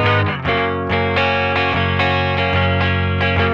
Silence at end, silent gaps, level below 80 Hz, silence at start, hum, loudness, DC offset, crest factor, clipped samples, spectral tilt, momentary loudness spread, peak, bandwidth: 0 s; none; -38 dBFS; 0 s; none; -17 LUFS; under 0.1%; 12 dB; under 0.1%; -7.5 dB/octave; 2 LU; -4 dBFS; 6.8 kHz